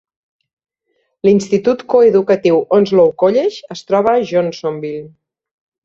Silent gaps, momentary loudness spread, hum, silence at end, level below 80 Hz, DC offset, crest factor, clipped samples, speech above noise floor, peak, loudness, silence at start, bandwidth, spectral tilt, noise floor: none; 11 LU; none; 0.75 s; -58 dBFS; under 0.1%; 14 dB; under 0.1%; 53 dB; 0 dBFS; -14 LUFS; 1.25 s; 7.8 kHz; -6.5 dB/octave; -66 dBFS